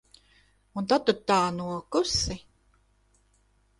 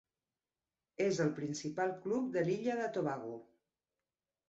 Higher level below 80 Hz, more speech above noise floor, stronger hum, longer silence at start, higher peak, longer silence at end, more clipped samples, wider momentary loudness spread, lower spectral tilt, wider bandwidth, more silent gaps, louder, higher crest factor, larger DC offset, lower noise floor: first, -50 dBFS vs -78 dBFS; second, 40 dB vs over 54 dB; first, 50 Hz at -55 dBFS vs none; second, 0.75 s vs 1 s; first, -8 dBFS vs -22 dBFS; first, 1.4 s vs 1.05 s; neither; about the same, 11 LU vs 11 LU; second, -4 dB/octave vs -6 dB/octave; first, 11.5 kHz vs 8 kHz; neither; first, -27 LUFS vs -37 LUFS; first, 22 dB vs 16 dB; neither; second, -66 dBFS vs under -90 dBFS